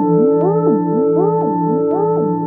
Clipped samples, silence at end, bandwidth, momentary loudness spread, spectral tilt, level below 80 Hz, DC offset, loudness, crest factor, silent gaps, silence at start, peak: under 0.1%; 0 s; 2.1 kHz; 3 LU; -14.5 dB/octave; -72 dBFS; under 0.1%; -15 LUFS; 12 dB; none; 0 s; -4 dBFS